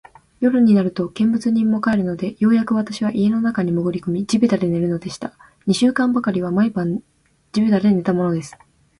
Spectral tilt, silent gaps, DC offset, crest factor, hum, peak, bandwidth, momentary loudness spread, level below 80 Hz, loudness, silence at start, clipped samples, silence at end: -7 dB/octave; none; under 0.1%; 14 dB; none; -4 dBFS; 11 kHz; 10 LU; -54 dBFS; -19 LUFS; 0.4 s; under 0.1%; 0.5 s